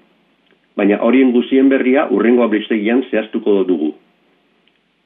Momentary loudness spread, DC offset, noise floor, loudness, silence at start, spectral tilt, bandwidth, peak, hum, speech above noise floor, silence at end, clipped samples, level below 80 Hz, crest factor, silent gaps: 7 LU; under 0.1%; -59 dBFS; -14 LUFS; 0.75 s; -10 dB/octave; 3.8 kHz; -2 dBFS; none; 45 dB; 1.1 s; under 0.1%; -66 dBFS; 14 dB; none